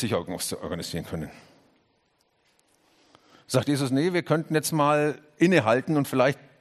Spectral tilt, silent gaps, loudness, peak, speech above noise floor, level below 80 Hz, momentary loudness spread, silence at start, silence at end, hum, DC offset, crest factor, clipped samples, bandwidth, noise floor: -5.5 dB/octave; none; -25 LUFS; -6 dBFS; 44 dB; -62 dBFS; 11 LU; 0 s; 0.25 s; none; under 0.1%; 20 dB; under 0.1%; 13 kHz; -69 dBFS